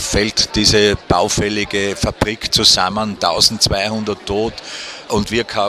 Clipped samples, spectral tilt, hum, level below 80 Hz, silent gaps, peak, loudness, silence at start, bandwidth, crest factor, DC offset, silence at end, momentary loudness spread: under 0.1%; -3 dB/octave; none; -34 dBFS; none; 0 dBFS; -15 LUFS; 0 s; 16 kHz; 16 dB; under 0.1%; 0 s; 10 LU